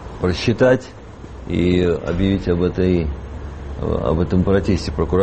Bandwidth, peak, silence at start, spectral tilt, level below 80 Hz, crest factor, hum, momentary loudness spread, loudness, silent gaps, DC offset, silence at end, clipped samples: 8.6 kHz; -2 dBFS; 0 s; -7.5 dB/octave; -30 dBFS; 16 dB; none; 16 LU; -19 LUFS; none; under 0.1%; 0 s; under 0.1%